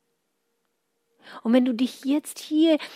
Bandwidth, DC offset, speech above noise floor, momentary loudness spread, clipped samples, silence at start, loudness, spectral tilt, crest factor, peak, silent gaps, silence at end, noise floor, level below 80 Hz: 15.5 kHz; under 0.1%; 53 dB; 7 LU; under 0.1%; 1.25 s; -24 LUFS; -4.5 dB/octave; 18 dB; -8 dBFS; none; 0 s; -75 dBFS; -84 dBFS